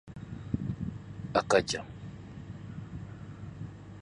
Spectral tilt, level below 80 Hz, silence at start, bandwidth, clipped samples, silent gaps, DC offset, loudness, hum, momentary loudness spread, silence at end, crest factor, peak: -5 dB/octave; -52 dBFS; 0.05 s; 11 kHz; under 0.1%; none; under 0.1%; -34 LUFS; none; 18 LU; 0 s; 24 dB; -10 dBFS